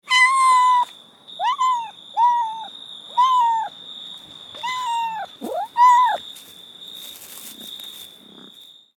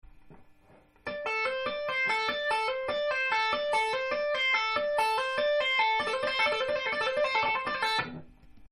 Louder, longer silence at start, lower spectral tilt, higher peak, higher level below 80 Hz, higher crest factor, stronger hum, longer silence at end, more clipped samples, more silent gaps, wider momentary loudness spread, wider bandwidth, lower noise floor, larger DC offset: first, -19 LUFS vs -28 LUFS; about the same, 0.1 s vs 0.05 s; second, 0.5 dB/octave vs -2 dB/octave; first, -6 dBFS vs -14 dBFS; second, -78 dBFS vs -62 dBFS; about the same, 16 dB vs 16 dB; neither; first, 0.9 s vs 0.05 s; neither; neither; first, 22 LU vs 6 LU; first, 19 kHz vs 12.5 kHz; second, -46 dBFS vs -60 dBFS; neither